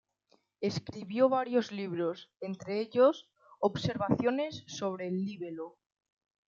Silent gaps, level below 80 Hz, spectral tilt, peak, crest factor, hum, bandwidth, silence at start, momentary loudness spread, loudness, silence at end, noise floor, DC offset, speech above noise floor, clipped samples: none; -70 dBFS; -6.5 dB/octave; -12 dBFS; 20 dB; none; 7.4 kHz; 0.6 s; 15 LU; -32 LUFS; 0.8 s; -72 dBFS; under 0.1%; 40 dB; under 0.1%